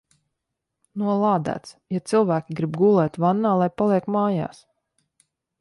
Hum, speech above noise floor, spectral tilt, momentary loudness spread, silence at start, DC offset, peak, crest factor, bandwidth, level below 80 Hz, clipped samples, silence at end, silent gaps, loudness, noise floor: none; 60 dB; -8 dB/octave; 12 LU; 0.95 s; under 0.1%; -8 dBFS; 16 dB; 11.5 kHz; -64 dBFS; under 0.1%; 1.15 s; none; -22 LUFS; -81 dBFS